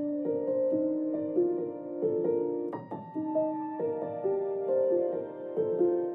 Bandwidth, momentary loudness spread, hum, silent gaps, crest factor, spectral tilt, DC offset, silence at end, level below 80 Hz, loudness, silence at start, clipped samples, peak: 3.3 kHz; 8 LU; none; none; 14 dB; -11.5 dB/octave; under 0.1%; 0 s; under -90 dBFS; -31 LUFS; 0 s; under 0.1%; -16 dBFS